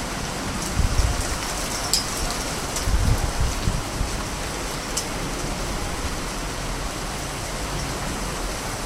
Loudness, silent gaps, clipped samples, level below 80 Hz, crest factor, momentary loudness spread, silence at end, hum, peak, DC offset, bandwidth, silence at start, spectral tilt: -26 LUFS; none; under 0.1%; -30 dBFS; 24 dB; 6 LU; 0 s; none; 0 dBFS; under 0.1%; 16 kHz; 0 s; -3.5 dB/octave